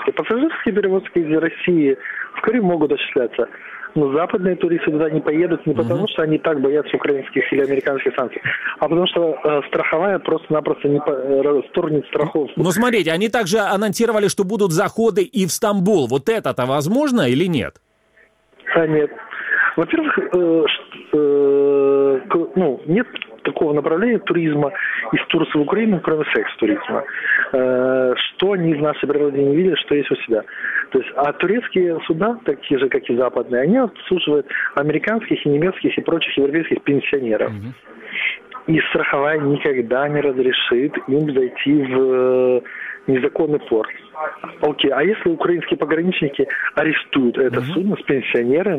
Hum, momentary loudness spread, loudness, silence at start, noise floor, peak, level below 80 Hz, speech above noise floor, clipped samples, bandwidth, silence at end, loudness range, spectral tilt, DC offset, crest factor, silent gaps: none; 5 LU; -18 LUFS; 0 s; -55 dBFS; -2 dBFS; -56 dBFS; 37 dB; under 0.1%; 15.5 kHz; 0 s; 2 LU; -5.5 dB/octave; under 0.1%; 16 dB; none